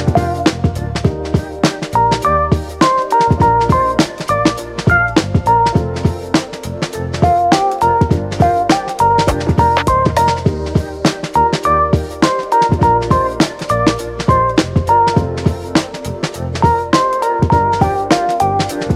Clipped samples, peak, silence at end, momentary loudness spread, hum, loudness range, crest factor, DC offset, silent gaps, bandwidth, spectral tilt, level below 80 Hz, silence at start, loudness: under 0.1%; 0 dBFS; 0 s; 6 LU; none; 2 LU; 14 dB; under 0.1%; none; 15.5 kHz; -6 dB/octave; -30 dBFS; 0 s; -14 LUFS